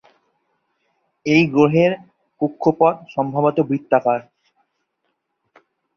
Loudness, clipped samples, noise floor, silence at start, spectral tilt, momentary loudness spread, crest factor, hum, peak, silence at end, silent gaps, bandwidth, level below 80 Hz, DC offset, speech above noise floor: -18 LUFS; under 0.1%; -73 dBFS; 1.25 s; -7.5 dB/octave; 10 LU; 18 dB; none; -2 dBFS; 1.75 s; none; 6.8 kHz; -60 dBFS; under 0.1%; 56 dB